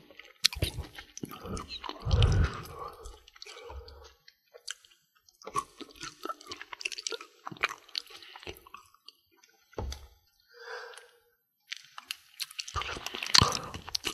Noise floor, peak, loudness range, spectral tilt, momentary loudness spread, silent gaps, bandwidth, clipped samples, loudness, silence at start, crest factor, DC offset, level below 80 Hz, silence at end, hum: -72 dBFS; 0 dBFS; 15 LU; -3 dB/octave; 21 LU; none; 15 kHz; under 0.1%; -32 LUFS; 0.25 s; 34 dB; under 0.1%; -42 dBFS; 0 s; none